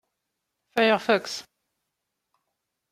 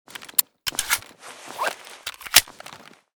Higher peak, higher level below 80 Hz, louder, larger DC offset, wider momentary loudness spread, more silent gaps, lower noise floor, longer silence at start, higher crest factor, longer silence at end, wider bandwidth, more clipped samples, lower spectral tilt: second, -6 dBFS vs 0 dBFS; second, -76 dBFS vs -56 dBFS; about the same, -23 LUFS vs -22 LUFS; neither; second, 14 LU vs 24 LU; neither; first, -82 dBFS vs -45 dBFS; first, 0.75 s vs 0.2 s; about the same, 24 dB vs 26 dB; first, 1.5 s vs 0.4 s; second, 16 kHz vs over 20 kHz; neither; first, -3.5 dB/octave vs 1.5 dB/octave